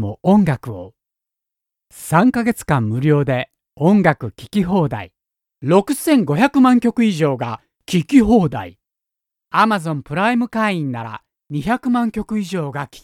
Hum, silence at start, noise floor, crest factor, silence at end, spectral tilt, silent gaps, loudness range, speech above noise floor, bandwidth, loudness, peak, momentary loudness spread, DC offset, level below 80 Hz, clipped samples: none; 0 s; -84 dBFS; 18 dB; 0.05 s; -6.5 dB/octave; none; 4 LU; 68 dB; 16 kHz; -17 LUFS; 0 dBFS; 15 LU; under 0.1%; -46 dBFS; under 0.1%